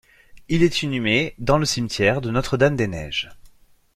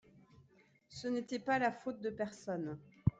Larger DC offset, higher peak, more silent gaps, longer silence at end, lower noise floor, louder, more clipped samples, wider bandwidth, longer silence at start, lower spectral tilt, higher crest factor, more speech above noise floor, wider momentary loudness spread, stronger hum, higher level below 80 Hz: neither; first, -2 dBFS vs -16 dBFS; neither; first, 0.45 s vs 0.1 s; second, -52 dBFS vs -68 dBFS; first, -21 LUFS vs -39 LUFS; neither; first, 14.5 kHz vs 9.2 kHz; second, 0.35 s vs 0.9 s; second, -5 dB/octave vs -6.5 dB/octave; about the same, 20 dB vs 24 dB; about the same, 32 dB vs 30 dB; second, 7 LU vs 11 LU; neither; first, -42 dBFS vs -60 dBFS